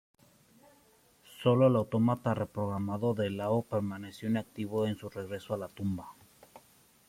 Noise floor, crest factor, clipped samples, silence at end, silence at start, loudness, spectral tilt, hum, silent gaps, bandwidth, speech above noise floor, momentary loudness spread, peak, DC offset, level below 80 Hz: -64 dBFS; 20 dB; under 0.1%; 0.5 s; 1.3 s; -32 LUFS; -8 dB/octave; none; none; 16 kHz; 34 dB; 13 LU; -12 dBFS; under 0.1%; -68 dBFS